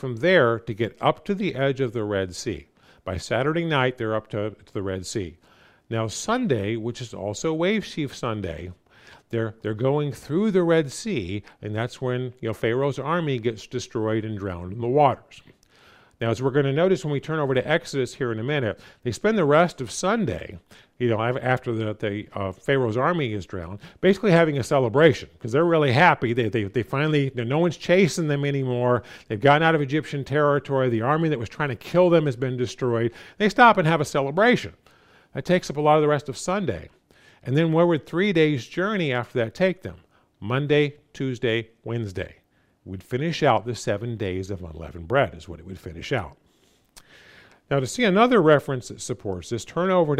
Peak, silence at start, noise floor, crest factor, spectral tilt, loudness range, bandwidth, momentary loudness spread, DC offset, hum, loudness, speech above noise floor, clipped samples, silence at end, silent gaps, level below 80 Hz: -2 dBFS; 0 s; -62 dBFS; 20 dB; -6 dB/octave; 7 LU; 15 kHz; 14 LU; under 0.1%; none; -23 LUFS; 39 dB; under 0.1%; 0 s; none; -56 dBFS